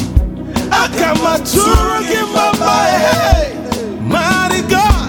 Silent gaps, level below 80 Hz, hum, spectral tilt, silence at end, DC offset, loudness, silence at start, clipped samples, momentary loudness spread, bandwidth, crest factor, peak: none; -20 dBFS; none; -4.5 dB/octave; 0 s; under 0.1%; -13 LUFS; 0 s; 0.1%; 8 LU; 20 kHz; 12 dB; 0 dBFS